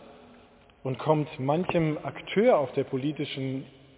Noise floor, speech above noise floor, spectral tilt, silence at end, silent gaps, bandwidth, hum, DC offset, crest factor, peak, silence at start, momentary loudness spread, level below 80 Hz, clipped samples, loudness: -56 dBFS; 29 dB; -11 dB/octave; 0.3 s; none; 4 kHz; none; under 0.1%; 18 dB; -10 dBFS; 0 s; 12 LU; -62 dBFS; under 0.1%; -28 LUFS